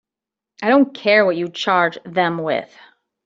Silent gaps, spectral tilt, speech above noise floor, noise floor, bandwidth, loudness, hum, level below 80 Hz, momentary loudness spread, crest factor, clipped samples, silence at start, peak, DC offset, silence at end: none; -5.5 dB/octave; 69 dB; -87 dBFS; 7.6 kHz; -18 LUFS; none; -66 dBFS; 8 LU; 16 dB; under 0.1%; 0.6 s; -2 dBFS; under 0.1%; 0.6 s